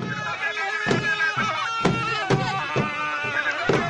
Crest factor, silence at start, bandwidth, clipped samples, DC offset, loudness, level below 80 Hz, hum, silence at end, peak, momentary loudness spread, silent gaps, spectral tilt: 14 dB; 0 s; 10.5 kHz; under 0.1%; under 0.1%; -23 LUFS; -52 dBFS; none; 0 s; -10 dBFS; 3 LU; none; -4.5 dB/octave